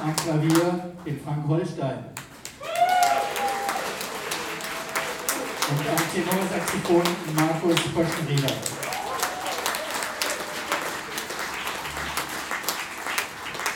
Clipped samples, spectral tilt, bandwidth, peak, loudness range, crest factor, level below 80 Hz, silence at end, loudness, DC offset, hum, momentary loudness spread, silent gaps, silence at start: under 0.1%; -4 dB/octave; 19 kHz; -4 dBFS; 4 LU; 24 dB; -56 dBFS; 0 s; -26 LUFS; under 0.1%; none; 9 LU; none; 0 s